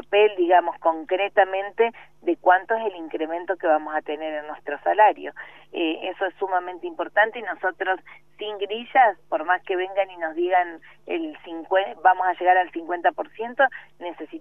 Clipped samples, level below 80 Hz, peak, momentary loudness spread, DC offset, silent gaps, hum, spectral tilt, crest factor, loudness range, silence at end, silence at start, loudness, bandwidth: under 0.1%; -72 dBFS; -4 dBFS; 14 LU; 0.2%; none; 50 Hz at -65 dBFS; -5.5 dB/octave; 20 dB; 2 LU; 0 s; 0.1 s; -23 LUFS; 3.7 kHz